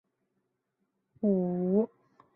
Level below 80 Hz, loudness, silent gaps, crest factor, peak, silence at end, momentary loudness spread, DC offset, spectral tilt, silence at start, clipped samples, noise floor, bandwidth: -76 dBFS; -30 LUFS; none; 18 dB; -14 dBFS; 0.5 s; 5 LU; under 0.1%; -14 dB/octave; 1.2 s; under 0.1%; -80 dBFS; 2.3 kHz